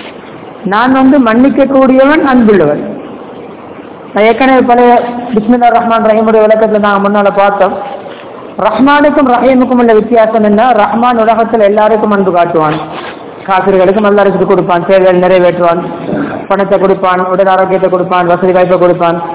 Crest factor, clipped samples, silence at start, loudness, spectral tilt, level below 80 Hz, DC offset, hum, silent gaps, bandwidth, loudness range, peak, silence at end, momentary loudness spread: 8 dB; 6%; 0 s; -7 LUFS; -10.5 dB/octave; -42 dBFS; under 0.1%; none; none; 4 kHz; 2 LU; 0 dBFS; 0 s; 16 LU